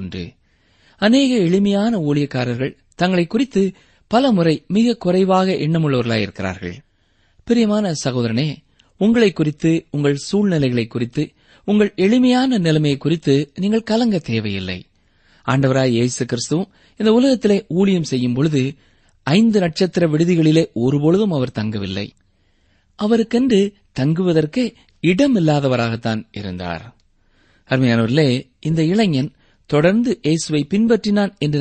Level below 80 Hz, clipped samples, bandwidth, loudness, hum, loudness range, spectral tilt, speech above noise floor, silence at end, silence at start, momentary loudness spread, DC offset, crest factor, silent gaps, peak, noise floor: -50 dBFS; under 0.1%; 8.8 kHz; -18 LUFS; none; 3 LU; -6.5 dB/octave; 43 dB; 0 s; 0 s; 11 LU; under 0.1%; 16 dB; none; -2 dBFS; -59 dBFS